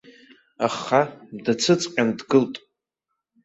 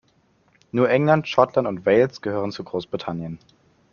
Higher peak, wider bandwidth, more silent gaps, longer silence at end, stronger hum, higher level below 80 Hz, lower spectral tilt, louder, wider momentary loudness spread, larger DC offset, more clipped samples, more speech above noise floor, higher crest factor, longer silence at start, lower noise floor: about the same, -4 dBFS vs -2 dBFS; first, 8.2 kHz vs 7 kHz; neither; first, 0.9 s vs 0.55 s; neither; second, -66 dBFS vs -60 dBFS; second, -4.5 dB/octave vs -7.5 dB/octave; about the same, -22 LUFS vs -22 LUFS; about the same, 10 LU vs 12 LU; neither; neither; first, 59 dB vs 41 dB; about the same, 20 dB vs 22 dB; second, 0.6 s vs 0.75 s; first, -81 dBFS vs -62 dBFS